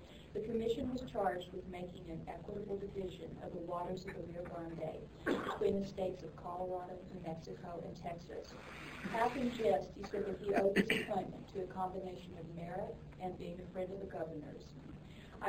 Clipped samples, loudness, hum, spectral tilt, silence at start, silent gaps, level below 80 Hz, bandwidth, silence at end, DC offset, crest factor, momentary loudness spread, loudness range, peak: under 0.1%; -41 LUFS; none; -6 dB/octave; 0 s; none; -60 dBFS; 16 kHz; 0 s; under 0.1%; 22 dB; 13 LU; 8 LU; -18 dBFS